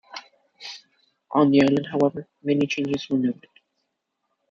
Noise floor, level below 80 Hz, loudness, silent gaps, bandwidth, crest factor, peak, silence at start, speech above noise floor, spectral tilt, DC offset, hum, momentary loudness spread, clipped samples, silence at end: -77 dBFS; -66 dBFS; -22 LUFS; none; 7.4 kHz; 20 dB; -6 dBFS; 0.15 s; 56 dB; -6.5 dB/octave; under 0.1%; none; 22 LU; under 0.1%; 1.15 s